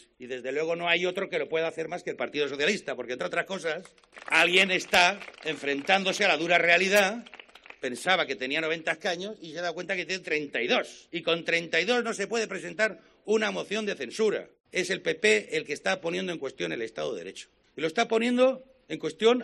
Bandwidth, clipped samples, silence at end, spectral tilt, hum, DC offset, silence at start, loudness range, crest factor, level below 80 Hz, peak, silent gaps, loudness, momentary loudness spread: 12 kHz; under 0.1%; 0 s; -3 dB/octave; none; under 0.1%; 0.2 s; 6 LU; 22 dB; -70 dBFS; -6 dBFS; 14.60-14.64 s; -27 LUFS; 13 LU